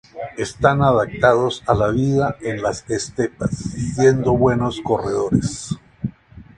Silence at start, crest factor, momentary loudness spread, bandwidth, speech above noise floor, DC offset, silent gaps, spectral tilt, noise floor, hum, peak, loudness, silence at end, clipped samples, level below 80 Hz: 0.15 s; 18 dB; 12 LU; 11 kHz; 23 dB; under 0.1%; none; -6 dB/octave; -41 dBFS; none; 0 dBFS; -19 LUFS; 0.15 s; under 0.1%; -40 dBFS